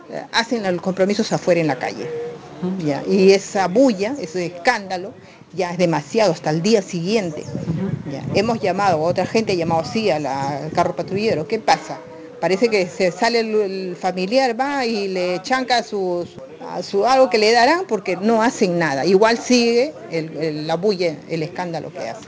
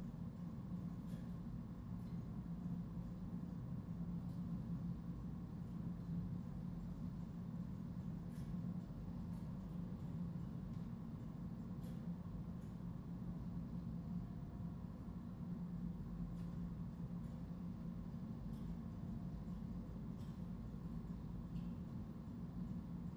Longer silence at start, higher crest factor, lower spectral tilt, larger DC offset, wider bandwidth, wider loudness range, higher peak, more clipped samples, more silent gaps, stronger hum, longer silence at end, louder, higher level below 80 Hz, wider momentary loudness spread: about the same, 0 s vs 0 s; about the same, 18 dB vs 14 dB; second, -5 dB/octave vs -9.5 dB/octave; neither; second, 8 kHz vs over 20 kHz; about the same, 4 LU vs 2 LU; first, 0 dBFS vs -34 dBFS; neither; neither; neither; about the same, 0 s vs 0 s; first, -19 LUFS vs -49 LUFS; about the same, -56 dBFS vs -58 dBFS; first, 12 LU vs 3 LU